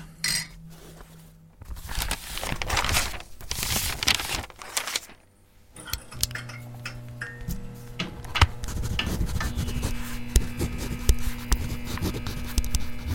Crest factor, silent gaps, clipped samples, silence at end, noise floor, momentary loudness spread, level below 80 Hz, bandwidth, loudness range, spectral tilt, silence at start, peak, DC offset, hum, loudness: 28 dB; none; under 0.1%; 0 s; -56 dBFS; 16 LU; -32 dBFS; 17 kHz; 6 LU; -3 dB/octave; 0 s; 0 dBFS; under 0.1%; none; -29 LUFS